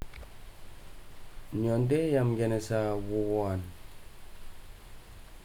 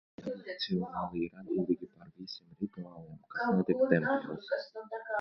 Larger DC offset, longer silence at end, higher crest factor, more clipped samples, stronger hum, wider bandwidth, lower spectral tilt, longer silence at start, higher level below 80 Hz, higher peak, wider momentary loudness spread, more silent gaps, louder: neither; about the same, 0 s vs 0 s; second, 16 dB vs 24 dB; neither; neither; first, 18 kHz vs 6.2 kHz; about the same, -7.5 dB/octave vs -8 dB/octave; second, 0 s vs 0.2 s; first, -48 dBFS vs -68 dBFS; second, -16 dBFS vs -10 dBFS; first, 25 LU vs 17 LU; neither; first, -30 LUFS vs -34 LUFS